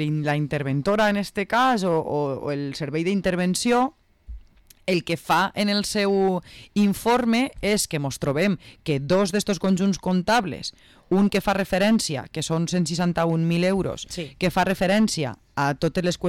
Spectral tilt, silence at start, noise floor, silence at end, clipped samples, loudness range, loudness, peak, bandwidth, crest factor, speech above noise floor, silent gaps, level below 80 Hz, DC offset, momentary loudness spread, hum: -5 dB/octave; 0 s; -49 dBFS; 0 s; under 0.1%; 2 LU; -23 LUFS; -12 dBFS; 16 kHz; 12 dB; 26 dB; none; -48 dBFS; under 0.1%; 8 LU; none